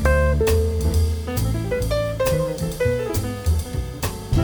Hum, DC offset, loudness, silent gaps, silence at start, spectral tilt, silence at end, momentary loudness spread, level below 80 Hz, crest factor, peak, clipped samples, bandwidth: none; under 0.1%; -22 LUFS; none; 0 s; -6 dB/octave; 0 s; 7 LU; -26 dBFS; 14 dB; -6 dBFS; under 0.1%; over 20 kHz